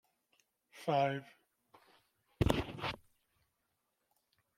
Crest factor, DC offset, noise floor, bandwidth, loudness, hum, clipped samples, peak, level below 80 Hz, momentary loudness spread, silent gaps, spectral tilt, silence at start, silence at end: 28 dB; under 0.1%; -84 dBFS; 16.5 kHz; -37 LUFS; none; under 0.1%; -12 dBFS; -54 dBFS; 11 LU; none; -6 dB/octave; 0.75 s; 1.6 s